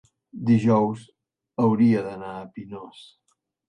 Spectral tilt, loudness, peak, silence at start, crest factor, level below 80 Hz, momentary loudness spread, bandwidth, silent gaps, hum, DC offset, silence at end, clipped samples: -9 dB/octave; -22 LUFS; -8 dBFS; 0.35 s; 16 dB; -62 dBFS; 20 LU; 8.8 kHz; none; none; under 0.1%; 0.85 s; under 0.1%